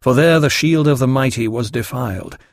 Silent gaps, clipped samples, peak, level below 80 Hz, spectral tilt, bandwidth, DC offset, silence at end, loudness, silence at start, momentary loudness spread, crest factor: none; under 0.1%; -2 dBFS; -46 dBFS; -5.5 dB/octave; 15.5 kHz; under 0.1%; 0.15 s; -16 LUFS; 0.05 s; 11 LU; 14 dB